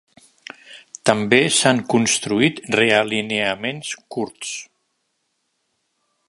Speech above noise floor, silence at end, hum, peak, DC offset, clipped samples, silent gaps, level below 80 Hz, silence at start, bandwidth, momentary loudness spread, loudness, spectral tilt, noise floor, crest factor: 53 dB; 1.65 s; none; 0 dBFS; under 0.1%; under 0.1%; none; -60 dBFS; 0.7 s; 11.5 kHz; 20 LU; -19 LUFS; -3 dB/octave; -72 dBFS; 22 dB